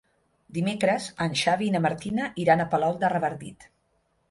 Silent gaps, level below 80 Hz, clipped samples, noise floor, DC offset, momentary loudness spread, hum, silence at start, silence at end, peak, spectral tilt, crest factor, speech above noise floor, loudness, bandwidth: none; -62 dBFS; under 0.1%; -70 dBFS; under 0.1%; 8 LU; none; 0.5 s; 0.65 s; -8 dBFS; -5.5 dB/octave; 20 dB; 45 dB; -25 LUFS; 11.5 kHz